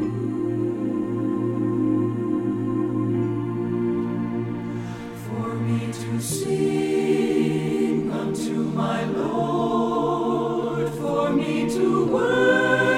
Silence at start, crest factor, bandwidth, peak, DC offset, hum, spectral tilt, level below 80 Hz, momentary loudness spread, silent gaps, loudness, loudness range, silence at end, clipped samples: 0 s; 16 dB; 16 kHz; -8 dBFS; under 0.1%; none; -6.5 dB/octave; -54 dBFS; 6 LU; none; -23 LUFS; 4 LU; 0 s; under 0.1%